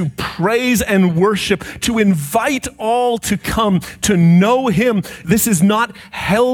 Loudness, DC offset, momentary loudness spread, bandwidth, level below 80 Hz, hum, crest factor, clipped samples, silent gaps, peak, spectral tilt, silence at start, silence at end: -15 LUFS; under 0.1%; 7 LU; 18 kHz; -40 dBFS; none; 14 dB; under 0.1%; none; 0 dBFS; -5 dB/octave; 0 s; 0 s